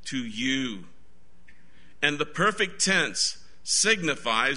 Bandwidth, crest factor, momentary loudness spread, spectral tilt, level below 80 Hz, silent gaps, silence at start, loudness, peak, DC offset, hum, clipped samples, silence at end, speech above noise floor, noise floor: 11 kHz; 22 dB; 10 LU; -2 dB/octave; -60 dBFS; none; 0.05 s; -25 LUFS; -6 dBFS; 1%; none; under 0.1%; 0 s; 34 dB; -60 dBFS